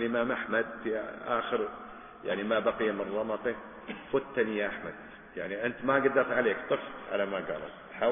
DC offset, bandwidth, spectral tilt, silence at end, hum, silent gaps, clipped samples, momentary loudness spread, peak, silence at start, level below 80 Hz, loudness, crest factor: under 0.1%; 3.7 kHz; -9 dB/octave; 0 s; none; none; under 0.1%; 15 LU; -10 dBFS; 0 s; -64 dBFS; -31 LUFS; 20 dB